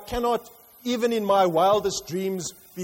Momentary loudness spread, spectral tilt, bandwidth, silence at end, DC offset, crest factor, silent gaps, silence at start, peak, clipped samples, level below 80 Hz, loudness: 12 LU; -4.5 dB/octave; 16.5 kHz; 0 s; under 0.1%; 14 dB; none; 0 s; -10 dBFS; under 0.1%; -50 dBFS; -24 LUFS